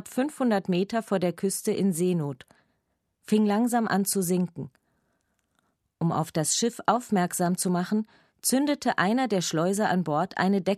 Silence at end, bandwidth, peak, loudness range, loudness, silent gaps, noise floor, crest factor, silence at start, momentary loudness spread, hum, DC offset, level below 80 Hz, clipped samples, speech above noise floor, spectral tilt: 0 s; 14 kHz; -8 dBFS; 3 LU; -26 LUFS; none; -76 dBFS; 18 dB; 0.05 s; 6 LU; none; under 0.1%; -70 dBFS; under 0.1%; 51 dB; -5 dB/octave